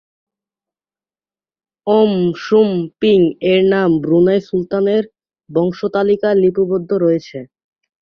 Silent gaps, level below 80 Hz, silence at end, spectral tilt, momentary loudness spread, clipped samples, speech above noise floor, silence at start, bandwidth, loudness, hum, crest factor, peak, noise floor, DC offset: none; -56 dBFS; 0.6 s; -8 dB/octave; 7 LU; under 0.1%; over 76 dB; 1.85 s; 6.6 kHz; -15 LUFS; none; 14 dB; -2 dBFS; under -90 dBFS; under 0.1%